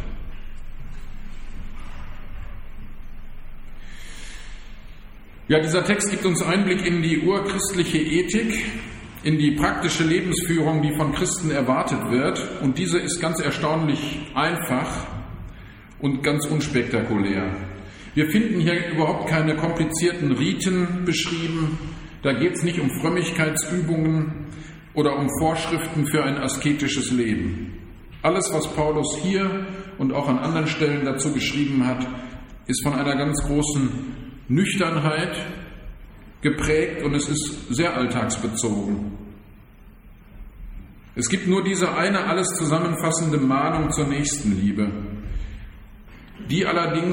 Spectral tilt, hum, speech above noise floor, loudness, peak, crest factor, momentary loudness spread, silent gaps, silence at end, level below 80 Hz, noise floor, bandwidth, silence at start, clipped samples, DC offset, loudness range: -5 dB/octave; none; 24 dB; -22 LUFS; -4 dBFS; 20 dB; 20 LU; none; 0 s; -40 dBFS; -46 dBFS; 16.5 kHz; 0 s; under 0.1%; under 0.1%; 5 LU